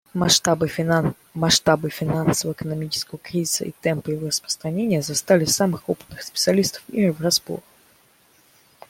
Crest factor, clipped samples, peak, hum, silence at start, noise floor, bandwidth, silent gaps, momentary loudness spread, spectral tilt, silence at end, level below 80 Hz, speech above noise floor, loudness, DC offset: 20 dB; under 0.1%; -2 dBFS; none; 0.15 s; -57 dBFS; 16.5 kHz; none; 10 LU; -4 dB/octave; 1.3 s; -54 dBFS; 35 dB; -21 LUFS; under 0.1%